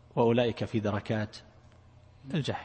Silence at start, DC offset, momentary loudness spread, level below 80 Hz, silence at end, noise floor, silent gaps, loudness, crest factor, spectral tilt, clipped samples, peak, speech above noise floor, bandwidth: 0.15 s; under 0.1%; 12 LU; -60 dBFS; 0 s; -56 dBFS; none; -30 LUFS; 18 dB; -7 dB/octave; under 0.1%; -12 dBFS; 27 dB; 8.8 kHz